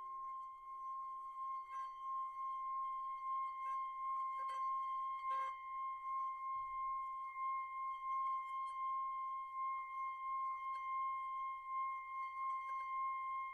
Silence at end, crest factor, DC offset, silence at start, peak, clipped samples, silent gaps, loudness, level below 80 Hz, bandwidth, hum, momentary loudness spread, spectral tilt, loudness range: 0 s; 10 dB; under 0.1%; 0 s; -34 dBFS; under 0.1%; none; -44 LUFS; -80 dBFS; 10 kHz; none; 5 LU; -0.5 dB/octave; 2 LU